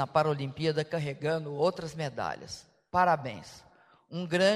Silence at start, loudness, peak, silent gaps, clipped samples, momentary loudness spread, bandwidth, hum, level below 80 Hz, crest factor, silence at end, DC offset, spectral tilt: 0 s; -31 LUFS; -10 dBFS; none; under 0.1%; 16 LU; 14 kHz; none; -64 dBFS; 20 dB; 0 s; under 0.1%; -5.5 dB/octave